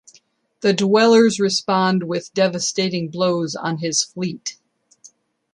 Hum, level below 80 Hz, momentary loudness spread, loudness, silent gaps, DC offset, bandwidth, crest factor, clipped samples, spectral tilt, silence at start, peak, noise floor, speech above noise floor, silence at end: none; -66 dBFS; 11 LU; -19 LUFS; none; under 0.1%; 11.5 kHz; 16 dB; under 0.1%; -4 dB/octave; 0.6 s; -4 dBFS; -57 dBFS; 38 dB; 0.45 s